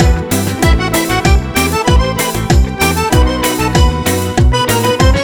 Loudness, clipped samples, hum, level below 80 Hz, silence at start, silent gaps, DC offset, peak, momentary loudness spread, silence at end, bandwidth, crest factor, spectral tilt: -12 LUFS; under 0.1%; none; -16 dBFS; 0 s; none; under 0.1%; 0 dBFS; 3 LU; 0 s; over 20 kHz; 12 dB; -5 dB/octave